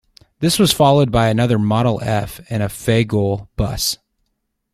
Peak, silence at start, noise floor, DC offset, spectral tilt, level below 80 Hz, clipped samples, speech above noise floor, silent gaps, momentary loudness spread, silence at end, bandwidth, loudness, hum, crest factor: -2 dBFS; 0.4 s; -71 dBFS; under 0.1%; -5.5 dB/octave; -38 dBFS; under 0.1%; 55 dB; none; 10 LU; 0.8 s; 15.5 kHz; -17 LUFS; none; 16 dB